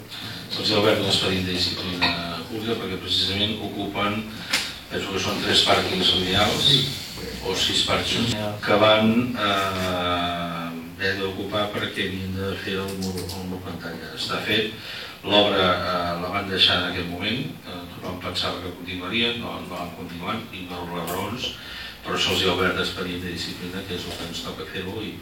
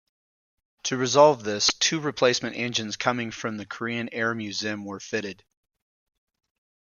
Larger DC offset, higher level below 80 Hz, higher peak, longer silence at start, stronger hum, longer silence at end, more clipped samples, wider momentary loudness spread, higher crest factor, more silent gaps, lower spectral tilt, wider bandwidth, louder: neither; first, -50 dBFS vs -68 dBFS; about the same, -2 dBFS vs -4 dBFS; second, 0 s vs 0.85 s; neither; second, 0 s vs 1.55 s; neither; about the same, 14 LU vs 14 LU; about the same, 22 dB vs 24 dB; neither; about the same, -4 dB/octave vs -3 dB/octave; first, 19.5 kHz vs 7.4 kHz; about the same, -23 LUFS vs -25 LUFS